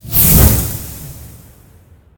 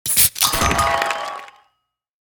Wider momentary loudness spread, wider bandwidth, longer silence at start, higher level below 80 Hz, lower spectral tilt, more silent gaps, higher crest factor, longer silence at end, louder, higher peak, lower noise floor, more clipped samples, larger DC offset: first, 23 LU vs 15 LU; about the same, over 20 kHz vs over 20 kHz; about the same, 0.05 s vs 0.05 s; first, -22 dBFS vs -36 dBFS; first, -4.5 dB/octave vs -1.5 dB/octave; neither; second, 14 dB vs 20 dB; first, 0.9 s vs 0.75 s; first, -10 LUFS vs -16 LUFS; about the same, 0 dBFS vs 0 dBFS; second, -45 dBFS vs -72 dBFS; first, 0.2% vs under 0.1%; neither